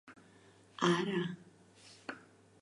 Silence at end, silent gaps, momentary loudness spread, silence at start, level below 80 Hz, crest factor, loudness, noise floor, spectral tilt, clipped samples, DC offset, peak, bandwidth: 0.4 s; none; 23 LU; 0.05 s; -82 dBFS; 24 dB; -35 LUFS; -62 dBFS; -5.5 dB/octave; under 0.1%; under 0.1%; -14 dBFS; 11 kHz